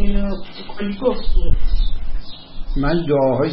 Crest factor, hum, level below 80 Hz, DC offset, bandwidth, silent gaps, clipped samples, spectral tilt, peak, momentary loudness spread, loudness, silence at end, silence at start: 12 dB; none; -20 dBFS; under 0.1%; 5.4 kHz; none; under 0.1%; -12 dB/octave; -2 dBFS; 17 LU; -22 LUFS; 0 s; 0 s